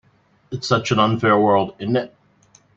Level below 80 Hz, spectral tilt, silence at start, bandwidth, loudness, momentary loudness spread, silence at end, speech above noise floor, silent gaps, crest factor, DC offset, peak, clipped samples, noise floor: -58 dBFS; -6 dB/octave; 0.5 s; 8 kHz; -19 LUFS; 14 LU; 0.7 s; 37 dB; none; 18 dB; under 0.1%; -2 dBFS; under 0.1%; -55 dBFS